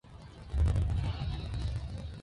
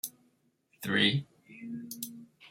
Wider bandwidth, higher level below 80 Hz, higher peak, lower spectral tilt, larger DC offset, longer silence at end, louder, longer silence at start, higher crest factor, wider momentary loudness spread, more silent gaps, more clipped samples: second, 11 kHz vs 16.5 kHz; first, -36 dBFS vs -74 dBFS; second, -18 dBFS vs -12 dBFS; first, -7 dB/octave vs -4 dB/octave; neither; about the same, 0 s vs 0 s; about the same, -34 LUFS vs -32 LUFS; about the same, 0.05 s vs 0.05 s; second, 14 dB vs 22 dB; second, 13 LU vs 23 LU; neither; neither